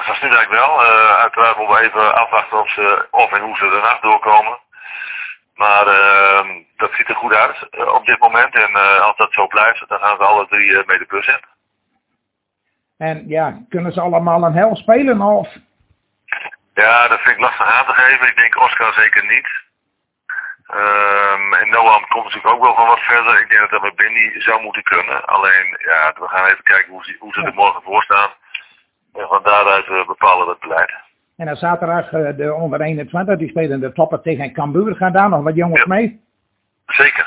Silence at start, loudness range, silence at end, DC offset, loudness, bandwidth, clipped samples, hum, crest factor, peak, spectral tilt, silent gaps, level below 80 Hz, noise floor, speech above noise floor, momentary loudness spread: 0 s; 6 LU; 0 s; under 0.1%; -12 LUFS; 4 kHz; 0.2%; none; 14 dB; 0 dBFS; -8 dB/octave; none; -58 dBFS; -75 dBFS; 61 dB; 13 LU